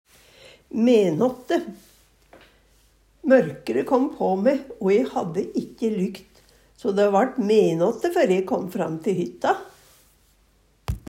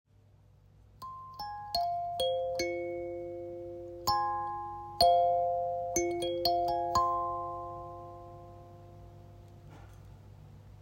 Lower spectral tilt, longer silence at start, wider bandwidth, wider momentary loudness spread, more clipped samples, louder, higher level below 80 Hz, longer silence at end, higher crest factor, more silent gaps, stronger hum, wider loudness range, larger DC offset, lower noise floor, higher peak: first, -6.5 dB/octave vs -3.5 dB/octave; second, 0.75 s vs 0.95 s; about the same, 16 kHz vs 16 kHz; second, 11 LU vs 24 LU; neither; first, -22 LUFS vs -32 LUFS; first, -50 dBFS vs -58 dBFS; about the same, 0.1 s vs 0 s; about the same, 18 dB vs 22 dB; neither; neither; second, 3 LU vs 10 LU; neither; about the same, -61 dBFS vs -61 dBFS; first, -6 dBFS vs -12 dBFS